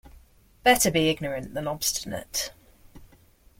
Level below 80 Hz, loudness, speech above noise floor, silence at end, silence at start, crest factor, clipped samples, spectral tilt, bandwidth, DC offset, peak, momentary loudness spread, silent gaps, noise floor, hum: -52 dBFS; -25 LUFS; 31 dB; 0.55 s; 0.05 s; 22 dB; under 0.1%; -3 dB/octave; 16.5 kHz; under 0.1%; -6 dBFS; 12 LU; none; -57 dBFS; none